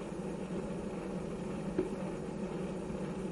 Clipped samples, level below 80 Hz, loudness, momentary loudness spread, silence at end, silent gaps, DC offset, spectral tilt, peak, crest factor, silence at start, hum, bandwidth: under 0.1%; -54 dBFS; -39 LUFS; 3 LU; 0 s; none; under 0.1%; -7 dB/octave; -20 dBFS; 20 dB; 0 s; none; 11.5 kHz